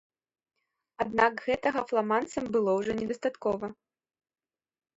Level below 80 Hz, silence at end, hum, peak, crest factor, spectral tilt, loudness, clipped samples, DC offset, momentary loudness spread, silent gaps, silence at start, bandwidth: -64 dBFS; 1.25 s; none; -10 dBFS; 22 dB; -5.5 dB/octave; -29 LUFS; under 0.1%; under 0.1%; 7 LU; none; 1 s; 8 kHz